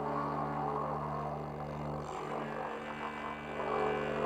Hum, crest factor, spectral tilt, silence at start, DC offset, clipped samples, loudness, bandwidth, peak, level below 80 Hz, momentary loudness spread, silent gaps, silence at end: none; 16 dB; -7 dB/octave; 0 s; under 0.1%; under 0.1%; -38 LUFS; 13 kHz; -20 dBFS; -58 dBFS; 6 LU; none; 0 s